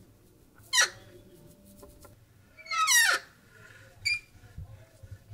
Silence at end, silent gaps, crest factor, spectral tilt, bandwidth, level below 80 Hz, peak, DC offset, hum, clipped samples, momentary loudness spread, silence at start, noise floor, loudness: 0 s; none; 22 dB; 1 dB/octave; 16 kHz; -60 dBFS; -10 dBFS; under 0.1%; none; under 0.1%; 27 LU; 0.75 s; -59 dBFS; -25 LUFS